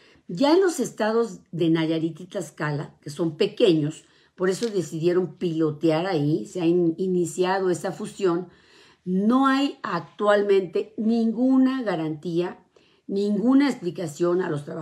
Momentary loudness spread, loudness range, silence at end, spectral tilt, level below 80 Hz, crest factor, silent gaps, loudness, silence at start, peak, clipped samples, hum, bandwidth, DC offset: 10 LU; 3 LU; 0 s; -6 dB/octave; -72 dBFS; 18 dB; none; -24 LUFS; 0.3 s; -6 dBFS; under 0.1%; none; 13.5 kHz; under 0.1%